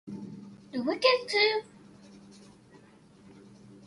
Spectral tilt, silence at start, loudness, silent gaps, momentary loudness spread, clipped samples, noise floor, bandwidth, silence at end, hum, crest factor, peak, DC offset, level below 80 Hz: -3.5 dB/octave; 0.05 s; -27 LUFS; none; 20 LU; under 0.1%; -56 dBFS; 11.5 kHz; 0.1 s; none; 24 dB; -10 dBFS; under 0.1%; -74 dBFS